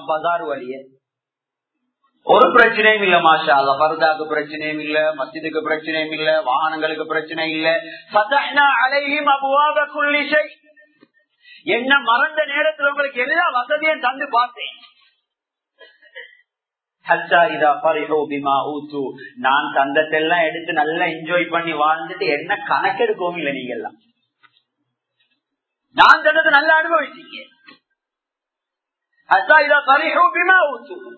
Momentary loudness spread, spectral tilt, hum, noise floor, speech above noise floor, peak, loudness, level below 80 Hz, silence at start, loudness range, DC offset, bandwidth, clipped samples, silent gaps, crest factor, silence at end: 14 LU; -5 dB/octave; none; -86 dBFS; 69 dB; 0 dBFS; -16 LUFS; -66 dBFS; 0 s; 6 LU; under 0.1%; 8 kHz; under 0.1%; none; 18 dB; 0 s